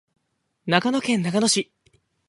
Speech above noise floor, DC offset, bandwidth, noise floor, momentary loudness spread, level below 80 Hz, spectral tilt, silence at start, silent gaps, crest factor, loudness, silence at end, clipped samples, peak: 52 dB; under 0.1%; 11.5 kHz; -73 dBFS; 13 LU; -68 dBFS; -3.5 dB/octave; 0.65 s; none; 24 dB; -21 LUFS; 0.65 s; under 0.1%; -2 dBFS